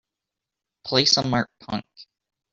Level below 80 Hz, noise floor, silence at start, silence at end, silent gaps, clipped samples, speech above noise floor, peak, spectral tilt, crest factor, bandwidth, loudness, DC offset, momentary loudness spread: -60 dBFS; -86 dBFS; 0.85 s; 0.5 s; none; under 0.1%; 63 dB; -4 dBFS; -3.5 dB/octave; 22 dB; 7.8 kHz; -22 LUFS; under 0.1%; 15 LU